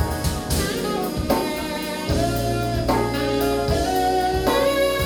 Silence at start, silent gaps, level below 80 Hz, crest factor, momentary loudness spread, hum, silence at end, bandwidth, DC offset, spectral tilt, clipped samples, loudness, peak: 0 s; none; -32 dBFS; 16 dB; 5 LU; none; 0 s; over 20 kHz; under 0.1%; -5 dB/octave; under 0.1%; -22 LUFS; -6 dBFS